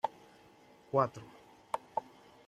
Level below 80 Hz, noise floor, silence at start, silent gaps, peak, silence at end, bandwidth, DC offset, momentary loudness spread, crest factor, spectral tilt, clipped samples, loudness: -76 dBFS; -61 dBFS; 0.05 s; none; -14 dBFS; 0.45 s; 14.5 kHz; under 0.1%; 22 LU; 24 dB; -6.5 dB/octave; under 0.1%; -36 LUFS